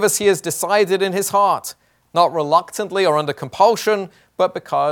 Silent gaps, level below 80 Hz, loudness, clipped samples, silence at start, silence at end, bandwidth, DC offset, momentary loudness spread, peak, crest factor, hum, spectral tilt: none; -64 dBFS; -18 LUFS; under 0.1%; 0 s; 0 s; 18 kHz; under 0.1%; 8 LU; 0 dBFS; 18 dB; none; -3.5 dB/octave